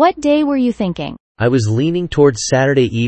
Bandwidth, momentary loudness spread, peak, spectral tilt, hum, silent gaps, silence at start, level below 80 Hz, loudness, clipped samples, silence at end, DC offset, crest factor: 8.8 kHz; 8 LU; 0 dBFS; -6 dB/octave; none; 1.20-1.35 s; 0 s; -42 dBFS; -15 LUFS; under 0.1%; 0 s; under 0.1%; 14 dB